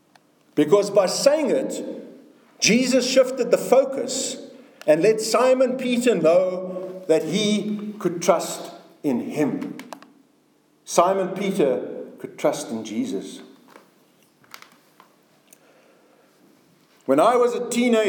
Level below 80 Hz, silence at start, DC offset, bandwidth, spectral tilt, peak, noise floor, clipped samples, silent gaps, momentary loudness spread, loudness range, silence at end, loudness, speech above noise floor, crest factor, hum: -84 dBFS; 0.55 s; under 0.1%; 19 kHz; -4 dB/octave; -2 dBFS; -61 dBFS; under 0.1%; none; 16 LU; 11 LU; 0 s; -21 LUFS; 41 dB; 20 dB; none